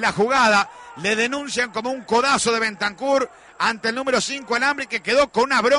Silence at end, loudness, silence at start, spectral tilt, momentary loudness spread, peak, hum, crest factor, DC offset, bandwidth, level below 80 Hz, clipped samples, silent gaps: 0 s; -20 LUFS; 0 s; -2.5 dB/octave; 7 LU; -8 dBFS; none; 14 dB; under 0.1%; 11 kHz; -56 dBFS; under 0.1%; none